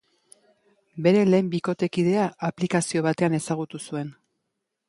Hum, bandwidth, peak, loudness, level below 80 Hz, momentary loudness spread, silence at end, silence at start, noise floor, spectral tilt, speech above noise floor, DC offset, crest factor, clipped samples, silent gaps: none; 11.5 kHz; -6 dBFS; -24 LUFS; -66 dBFS; 13 LU; 0.75 s; 0.95 s; -80 dBFS; -6 dB/octave; 57 dB; under 0.1%; 18 dB; under 0.1%; none